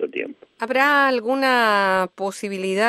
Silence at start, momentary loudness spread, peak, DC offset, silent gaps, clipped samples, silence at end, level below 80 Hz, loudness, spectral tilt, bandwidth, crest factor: 0 s; 13 LU; -4 dBFS; under 0.1%; none; under 0.1%; 0 s; -70 dBFS; -19 LUFS; -4 dB/octave; 14 kHz; 16 dB